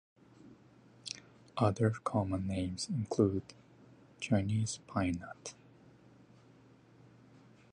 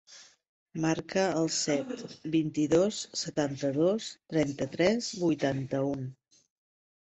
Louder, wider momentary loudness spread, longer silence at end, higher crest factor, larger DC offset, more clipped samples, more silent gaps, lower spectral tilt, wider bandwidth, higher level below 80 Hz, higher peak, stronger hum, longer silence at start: second, -35 LUFS vs -30 LUFS; first, 15 LU vs 7 LU; first, 2.2 s vs 1 s; about the same, 22 dB vs 18 dB; neither; neither; second, none vs 0.49-0.66 s; about the same, -6 dB/octave vs -5 dB/octave; first, 10.5 kHz vs 8.4 kHz; first, -58 dBFS vs -66 dBFS; second, -16 dBFS vs -12 dBFS; neither; first, 0.45 s vs 0.1 s